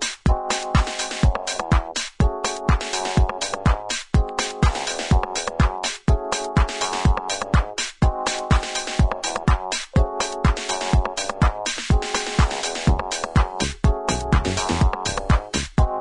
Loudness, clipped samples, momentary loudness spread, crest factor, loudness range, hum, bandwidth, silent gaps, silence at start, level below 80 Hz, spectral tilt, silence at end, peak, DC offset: -22 LUFS; under 0.1%; 3 LU; 16 dB; 1 LU; none; 11 kHz; none; 0 s; -24 dBFS; -4.5 dB/octave; 0 s; -4 dBFS; under 0.1%